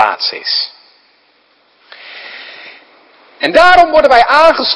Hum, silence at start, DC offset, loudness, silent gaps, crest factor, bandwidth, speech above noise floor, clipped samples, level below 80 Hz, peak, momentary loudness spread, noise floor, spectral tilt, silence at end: none; 0 s; under 0.1%; -8 LUFS; none; 12 dB; 11 kHz; 44 dB; 1%; -42 dBFS; 0 dBFS; 23 LU; -53 dBFS; -2.5 dB/octave; 0 s